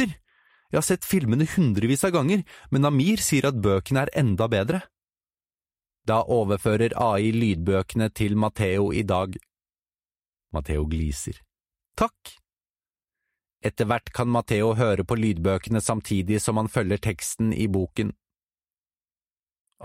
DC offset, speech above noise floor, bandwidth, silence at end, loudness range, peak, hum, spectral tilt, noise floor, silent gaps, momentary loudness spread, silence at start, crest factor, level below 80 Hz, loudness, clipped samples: under 0.1%; over 67 dB; 16 kHz; 0 s; 9 LU; -8 dBFS; none; -6 dB/octave; under -90 dBFS; 12.70-12.74 s, 19.32-19.36 s, 19.60-19.65 s; 8 LU; 0 s; 16 dB; -44 dBFS; -24 LUFS; under 0.1%